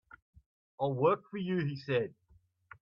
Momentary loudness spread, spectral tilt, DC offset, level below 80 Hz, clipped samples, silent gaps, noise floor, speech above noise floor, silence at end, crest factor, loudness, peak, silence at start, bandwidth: 7 LU; -9 dB/octave; under 0.1%; -72 dBFS; under 0.1%; none; -67 dBFS; 35 dB; 0.7 s; 18 dB; -33 LUFS; -16 dBFS; 0.8 s; 6.4 kHz